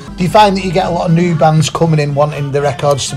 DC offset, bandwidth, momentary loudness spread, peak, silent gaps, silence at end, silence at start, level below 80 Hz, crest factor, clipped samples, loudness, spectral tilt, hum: under 0.1%; 13 kHz; 5 LU; 0 dBFS; none; 0 s; 0 s; -36 dBFS; 12 dB; under 0.1%; -12 LUFS; -6 dB/octave; none